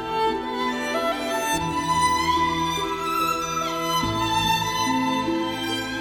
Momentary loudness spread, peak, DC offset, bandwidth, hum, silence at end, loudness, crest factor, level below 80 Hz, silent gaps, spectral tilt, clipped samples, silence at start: 5 LU; -10 dBFS; under 0.1%; 17.5 kHz; none; 0 s; -23 LUFS; 14 dB; -46 dBFS; none; -3.5 dB/octave; under 0.1%; 0 s